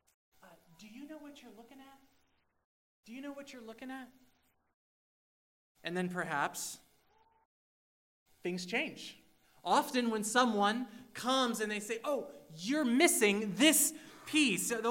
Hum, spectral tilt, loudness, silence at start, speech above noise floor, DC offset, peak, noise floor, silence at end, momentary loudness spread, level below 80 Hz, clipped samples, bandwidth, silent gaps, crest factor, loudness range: none; -2.5 dB/octave; -32 LUFS; 0.8 s; 41 dB; under 0.1%; -14 dBFS; -75 dBFS; 0 s; 22 LU; -80 dBFS; under 0.1%; 16 kHz; 2.65-3.03 s, 4.74-5.75 s, 7.45-8.26 s; 22 dB; 21 LU